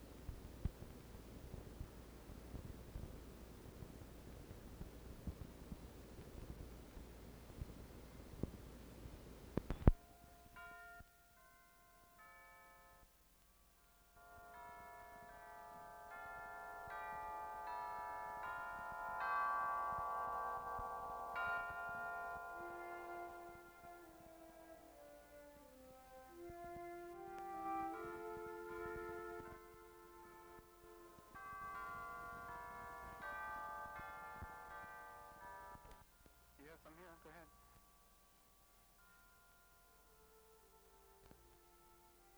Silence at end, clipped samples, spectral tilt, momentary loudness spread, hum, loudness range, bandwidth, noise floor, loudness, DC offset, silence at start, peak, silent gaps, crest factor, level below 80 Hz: 0 s; under 0.1%; -6.5 dB/octave; 22 LU; none; 20 LU; over 20 kHz; -71 dBFS; -49 LUFS; under 0.1%; 0 s; -12 dBFS; none; 38 dB; -56 dBFS